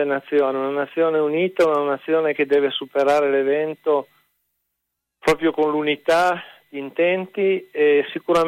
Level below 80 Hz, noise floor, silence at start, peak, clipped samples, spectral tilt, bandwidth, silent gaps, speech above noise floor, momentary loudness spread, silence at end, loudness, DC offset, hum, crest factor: -60 dBFS; -79 dBFS; 0 s; -6 dBFS; under 0.1%; -5 dB/octave; 15 kHz; none; 60 dB; 5 LU; 0 s; -20 LUFS; under 0.1%; none; 14 dB